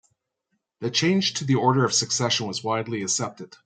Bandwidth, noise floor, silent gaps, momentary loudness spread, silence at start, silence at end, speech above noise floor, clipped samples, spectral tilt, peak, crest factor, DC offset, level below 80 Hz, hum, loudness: 9.4 kHz; -77 dBFS; none; 7 LU; 0.8 s; 0.2 s; 53 dB; under 0.1%; -3.5 dB/octave; -6 dBFS; 18 dB; under 0.1%; -68 dBFS; none; -23 LUFS